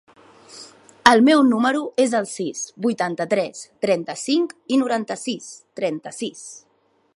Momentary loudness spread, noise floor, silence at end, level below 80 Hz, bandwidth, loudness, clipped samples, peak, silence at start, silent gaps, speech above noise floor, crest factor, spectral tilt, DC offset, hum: 17 LU; -44 dBFS; 0.55 s; -64 dBFS; 11.5 kHz; -21 LUFS; under 0.1%; 0 dBFS; 0.5 s; none; 24 dB; 22 dB; -4 dB/octave; under 0.1%; none